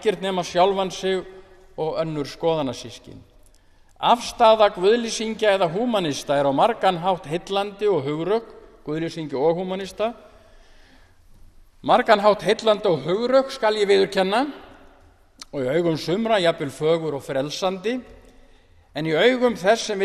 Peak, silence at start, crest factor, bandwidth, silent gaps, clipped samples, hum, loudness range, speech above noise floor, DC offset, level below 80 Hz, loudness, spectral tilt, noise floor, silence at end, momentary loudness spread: -2 dBFS; 0 s; 20 dB; 13.5 kHz; none; under 0.1%; none; 6 LU; 32 dB; under 0.1%; -54 dBFS; -21 LUFS; -4.5 dB/octave; -53 dBFS; 0 s; 12 LU